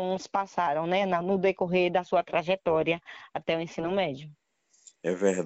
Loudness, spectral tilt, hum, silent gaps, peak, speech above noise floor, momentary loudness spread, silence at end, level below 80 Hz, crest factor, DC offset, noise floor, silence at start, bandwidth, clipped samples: -28 LUFS; -5.5 dB/octave; none; none; -10 dBFS; 31 dB; 8 LU; 0 s; -64 dBFS; 18 dB; under 0.1%; -59 dBFS; 0 s; 8.8 kHz; under 0.1%